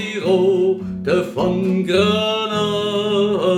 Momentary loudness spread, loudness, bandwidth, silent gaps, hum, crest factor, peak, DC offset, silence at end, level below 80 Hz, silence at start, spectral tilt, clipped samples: 4 LU; -18 LUFS; 13.5 kHz; none; none; 14 dB; -4 dBFS; under 0.1%; 0 s; -52 dBFS; 0 s; -6 dB/octave; under 0.1%